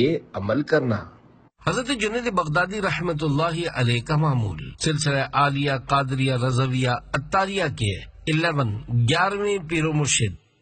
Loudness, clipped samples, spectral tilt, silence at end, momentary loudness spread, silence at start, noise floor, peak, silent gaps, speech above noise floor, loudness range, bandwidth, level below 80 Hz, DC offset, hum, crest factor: -23 LUFS; under 0.1%; -5 dB/octave; 0.25 s; 6 LU; 0 s; -52 dBFS; -6 dBFS; none; 29 dB; 2 LU; 9 kHz; -46 dBFS; under 0.1%; none; 18 dB